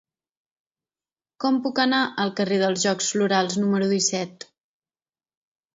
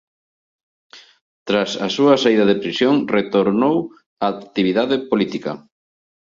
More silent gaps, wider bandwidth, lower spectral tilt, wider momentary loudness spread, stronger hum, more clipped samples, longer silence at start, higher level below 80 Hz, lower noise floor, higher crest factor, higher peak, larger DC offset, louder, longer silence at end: second, none vs 1.21-1.46 s, 4.06-4.17 s; about the same, 8 kHz vs 7.6 kHz; second, -3.5 dB/octave vs -5.5 dB/octave; second, 4 LU vs 11 LU; neither; neither; first, 1.4 s vs 0.95 s; second, -72 dBFS vs -60 dBFS; about the same, under -90 dBFS vs under -90 dBFS; about the same, 20 dB vs 18 dB; second, -6 dBFS vs -2 dBFS; neither; second, -22 LUFS vs -18 LUFS; first, 1.45 s vs 0.75 s